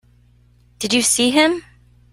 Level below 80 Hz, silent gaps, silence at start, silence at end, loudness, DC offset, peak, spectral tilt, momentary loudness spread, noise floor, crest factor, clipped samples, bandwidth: -54 dBFS; none; 0.8 s; 0.5 s; -16 LUFS; under 0.1%; -2 dBFS; -1.5 dB/octave; 14 LU; -53 dBFS; 18 dB; under 0.1%; 16 kHz